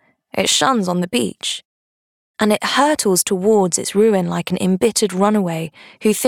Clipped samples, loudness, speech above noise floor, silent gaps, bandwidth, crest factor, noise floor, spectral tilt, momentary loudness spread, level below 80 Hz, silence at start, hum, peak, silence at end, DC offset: under 0.1%; -17 LUFS; over 73 dB; 1.65-2.34 s; 18.5 kHz; 16 dB; under -90 dBFS; -4 dB/octave; 9 LU; -60 dBFS; 0.35 s; none; -2 dBFS; 0 s; under 0.1%